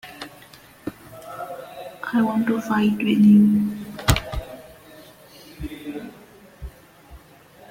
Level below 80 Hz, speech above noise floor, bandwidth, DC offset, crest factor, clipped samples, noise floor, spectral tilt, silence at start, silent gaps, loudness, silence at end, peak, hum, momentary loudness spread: -40 dBFS; 32 dB; 16.5 kHz; under 0.1%; 22 dB; under 0.1%; -49 dBFS; -6 dB/octave; 0.05 s; none; -20 LUFS; 0.55 s; -2 dBFS; none; 26 LU